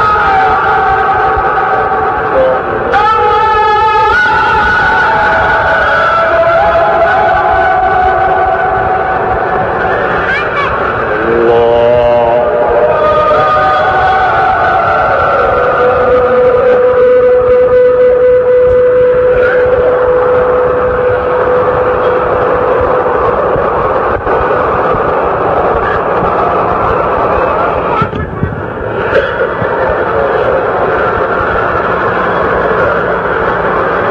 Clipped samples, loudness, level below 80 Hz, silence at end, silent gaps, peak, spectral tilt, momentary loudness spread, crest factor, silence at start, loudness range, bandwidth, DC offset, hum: under 0.1%; -9 LUFS; -30 dBFS; 0 s; none; 0 dBFS; -7 dB/octave; 4 LU; 8 dB; 0 s; 4 LU; 6.8 kHz; under 0.1%; none